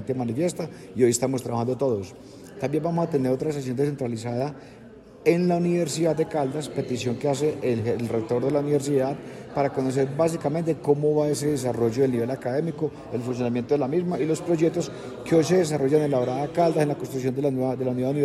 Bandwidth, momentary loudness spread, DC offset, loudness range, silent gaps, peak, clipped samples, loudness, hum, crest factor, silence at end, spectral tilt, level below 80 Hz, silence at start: 13.5 kHz; 8 LU; under 0.1%; 3 LU; none; -6 dBFS; under 0.1%; -25 LUFS; none; 18 dB; 0 s; -6.5 dB/octave; -60 dBFS; 0 s